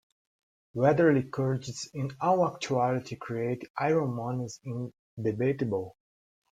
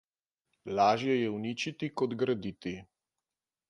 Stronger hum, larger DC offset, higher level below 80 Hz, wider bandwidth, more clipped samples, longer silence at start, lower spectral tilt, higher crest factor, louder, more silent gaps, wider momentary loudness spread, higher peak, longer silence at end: neither; neither; about the same, -66 dBFS vs -68 dBFS; second, 9.4 kHz vs 11 kHz; neither; about the same, 0.75 s vs 0.65 s; about the same, -6.5 dB/octave vs -5.5 dB/octave; about the same, 18 dB vs 20 dB; about the same, -29 LUFS vs -31 LUFS; first, 3.70-3.74 s, 4.99-5.17 s vs none; about the same, 13 LU vs 14 LU; about the same, -12 dBFS vs -14 dBFS; second, 0.7 s vs 0.85 s